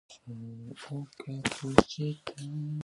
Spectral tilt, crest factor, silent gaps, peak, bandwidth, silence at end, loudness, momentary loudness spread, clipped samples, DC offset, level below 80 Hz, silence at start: -5.5 dB/octave; 32 dB; none; -2 dBFS; 11.5 kHz; 0 s; -31 LUFS; 19 LU; under 0.1%; under 0.1%; -52 dBFS; 0.1 s